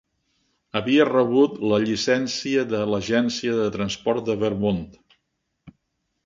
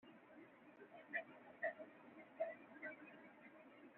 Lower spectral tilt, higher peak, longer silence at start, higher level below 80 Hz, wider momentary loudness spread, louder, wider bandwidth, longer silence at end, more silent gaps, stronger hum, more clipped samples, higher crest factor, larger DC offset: first, -5 dB/octave vs -2.5 dB/octave; first, -6 dBFS vs -32 dBFS; first, 0.75 s vs 0 s; first, -54 dBFS vs under -90 dBFS; second, 7 LU vs 16 LU; first, -22 LUFS vs -52 LUFS; first, 7.6 kHz vs 4 kHz; first, 0.55 s vs 0 s; neither; neither; neither; about the same, 18 dB vs 22 dB; neither